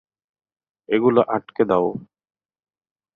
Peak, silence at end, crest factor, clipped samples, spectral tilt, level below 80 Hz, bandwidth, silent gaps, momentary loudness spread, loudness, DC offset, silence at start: -4 dBFS; 1.1 s; 20 dB; under 0.1%; -9.5 dB/octave; -62 dBFS; 4.6 kHz; none; 8 LU; -20 LUFS; under 0.1%; 0.9 s